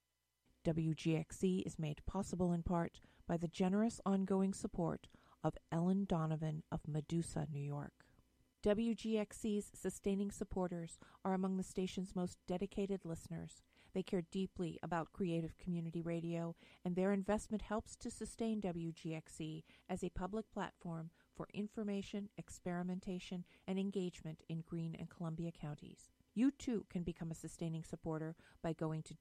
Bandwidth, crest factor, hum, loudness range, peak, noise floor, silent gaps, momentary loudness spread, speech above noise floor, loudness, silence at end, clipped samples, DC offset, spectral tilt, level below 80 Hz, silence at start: 13 kHz; 20 dB; none; 6 LU; -22 dBFS; -83 dBFS; none; 11 LU; 42 dB; -42 LUFS; 0.05 s; under 0.1%; under 0.1%; -7 dB/octave; -62 dBFS; 0.65 s